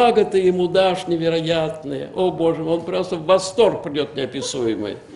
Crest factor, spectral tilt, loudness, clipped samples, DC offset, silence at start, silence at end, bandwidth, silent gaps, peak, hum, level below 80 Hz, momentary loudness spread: 16 dB; -5 dB/octave; -20 LUFS; under 0.1%; under 0.1%; 0 s; 0 s; 11.5 kHz; none; -2 dBFS; none; -54 dBFS; 8 LU